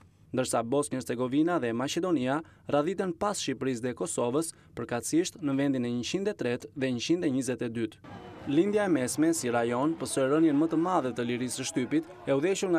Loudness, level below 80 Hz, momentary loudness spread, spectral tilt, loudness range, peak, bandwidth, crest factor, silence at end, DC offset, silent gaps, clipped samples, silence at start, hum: -29 LUFS; -66 dBFS; 7 LU; -5 dB/octave; 3 LU; -12 dBFS; 14 kHz; 16 dB; 0 s; under 0.1%; none; under 0.1%; 0.35 s; none